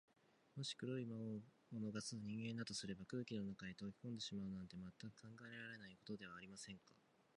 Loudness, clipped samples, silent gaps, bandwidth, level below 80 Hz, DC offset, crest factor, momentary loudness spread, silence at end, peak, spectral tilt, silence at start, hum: -51 LUFS; under 0.1%; none; 10.5 kHz; -78 dBFS; under 0.1%; 18 dB; 9 LU; 0.4 s; -34 dBFS; -4.5 dB/octave; 0.55 s; none